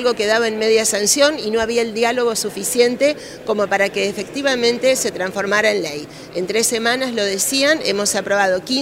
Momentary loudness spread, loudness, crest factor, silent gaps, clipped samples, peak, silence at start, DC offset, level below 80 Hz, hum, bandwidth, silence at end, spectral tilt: 7 LU; -17 LUFS; 16 dB; none; under 0.1%; 0 dBFS; 0 s; under 0.1%; -54 dBFS; none; 16 kHz; 0 s; -2 dB/octave